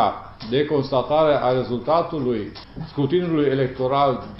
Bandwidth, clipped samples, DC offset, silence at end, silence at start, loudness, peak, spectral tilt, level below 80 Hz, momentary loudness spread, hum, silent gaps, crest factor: 5.8 kHz; under 0.1%; under 0.1%; 0 s; 0 s; -21 LUFS; -6 dBFS; -10 dB/octave; -48 dBFS; 10 LU; none; none; 16 dB